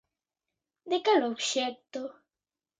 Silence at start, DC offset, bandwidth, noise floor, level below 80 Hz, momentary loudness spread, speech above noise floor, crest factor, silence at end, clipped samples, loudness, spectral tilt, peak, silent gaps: 0.85 s; under 0.1%; 9.6 kHz; under -90 dBFS; -84 dBFS; 15 LU; over 61 dB; 20 dB; 0.7 s; under 0.1%; -29 LUFS; -1.5 dB/octave; -12 dBFS; none